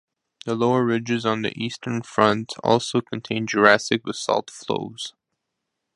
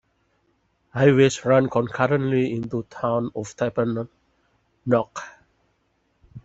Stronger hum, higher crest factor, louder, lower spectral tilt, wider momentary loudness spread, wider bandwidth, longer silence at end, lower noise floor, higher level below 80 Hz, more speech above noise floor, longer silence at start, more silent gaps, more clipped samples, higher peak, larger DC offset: neither; about the same, 22 dB vs 20 dB; about the same, -22 LUFS vs -22 LUFS; second, -4.5 dB/octave vs -6.5 dB/octave; second, 12 LU vs 16 LU; first, 11.5 kHz vs 8 kHz; first, 0.85 s vs 0.05 s; first, -80 dBFS vs -68 dBFS; second, -64 dBFS vs -58 dBFS; first, 58 dB vs 47 dB; second, 0.45 s vs 0.95 s; neither; neither; about the same, 0 dBFS vs -2 dBFS; neither